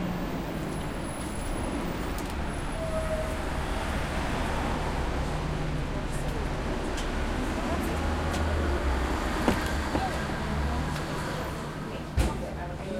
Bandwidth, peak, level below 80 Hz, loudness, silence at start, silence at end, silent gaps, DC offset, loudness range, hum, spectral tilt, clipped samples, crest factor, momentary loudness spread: 16 kHz; -8 dBFS; -34 dBFS; -31 LUFS; 0 s; 0 s; none; under 0.1%; 3 LU; none; -5.5 dB/octave; under 0.1%; 22 dB; 5 LU